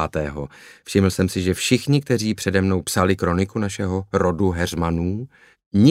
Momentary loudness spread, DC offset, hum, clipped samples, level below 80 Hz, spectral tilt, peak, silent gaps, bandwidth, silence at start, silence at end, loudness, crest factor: 9 LU; under 0.1%; none; under 0.1%; -42 dBFS; -5.5 dB/octave; -2 dBFS; 5.66-5.71 s; 16 kHz; 0 s; 0 s; -21 LUFS; 18 dB